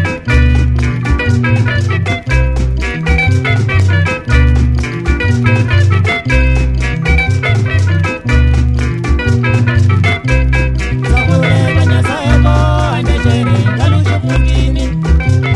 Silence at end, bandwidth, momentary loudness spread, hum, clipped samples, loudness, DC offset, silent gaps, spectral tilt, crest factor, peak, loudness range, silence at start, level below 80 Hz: 0 s; 11 kHz; 4 LU; none; under 0.1%; -12 LUFS; 0.3%; none; -6.5 dB/octave; 10 dB; 0 dBFS; 1 LU; 0 s; -16 dBFS